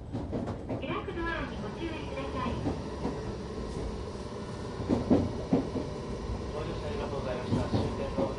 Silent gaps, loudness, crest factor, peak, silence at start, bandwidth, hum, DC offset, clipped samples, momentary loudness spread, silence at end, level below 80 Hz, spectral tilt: none; -34 LUFS; 20 dB; -12 dBFS; 0 s; 11.5 kHz; none; under 0.1%; under 0.1%; 8 LU; 0 s; -42 dBFS; -7 dB/octave